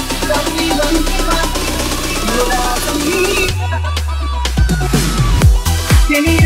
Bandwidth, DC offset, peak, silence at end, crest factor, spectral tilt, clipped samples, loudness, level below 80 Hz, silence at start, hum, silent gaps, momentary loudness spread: 16.5 kHz; under 0.1%; 0 dBFS; 0 s; 12 dB; -4.5 dB/octave; under 0.1%; -15 LUFS; -18 dBFS; 0 s; none; none; 6 LU